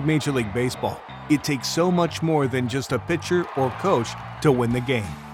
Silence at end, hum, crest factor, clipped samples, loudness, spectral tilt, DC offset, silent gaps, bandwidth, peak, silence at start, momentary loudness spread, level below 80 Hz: 0 s; none; 18 dB; under 0.1%; -23 LUFS; -5.5 dB/octave; under 0.1%; none; 17 kHz; -6 dBFS; 0 s; 5 LU; -50 dBFS